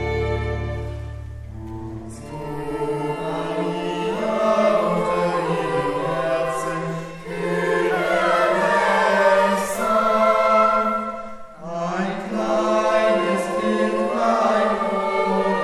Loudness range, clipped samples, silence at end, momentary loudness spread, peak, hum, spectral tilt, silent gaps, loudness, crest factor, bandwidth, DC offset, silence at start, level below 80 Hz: 9 LU; under 0.1%; 0 s; 16 LU; -4 dBFS; none; -5.5 dB/octave; none; -20 LUFS; 16 dB; 14.5 kHz; under 0.1%; 0 s; -42 dBFS